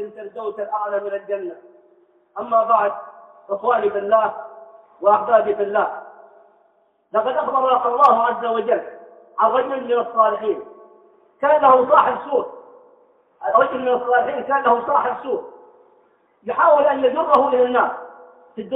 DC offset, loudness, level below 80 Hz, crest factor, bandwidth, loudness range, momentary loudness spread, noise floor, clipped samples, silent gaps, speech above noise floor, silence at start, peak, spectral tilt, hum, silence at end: under 0.1%; -18 LUFS; -68 dBFS; 18 dB; 5.2 kHz; 3 LU; 17 LU; -61 dBFS; under 0.1%; none; 43 dB; 0 s; -2 dBFS; -6.5 dB/octave; none; 0 s